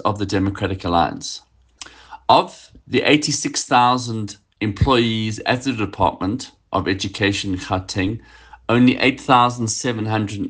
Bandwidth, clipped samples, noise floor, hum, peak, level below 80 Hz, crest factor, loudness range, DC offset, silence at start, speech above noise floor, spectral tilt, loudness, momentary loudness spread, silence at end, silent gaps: 10 kHz; under 0.1%; -42 dBFS; none; 0 dBFS; -44 dBFS; 20 dB; 3 LU; under 0.1%; 0 s; 23 dB; -4.5 dB/octave; -19 LUFS; 14 LU; 0 s; none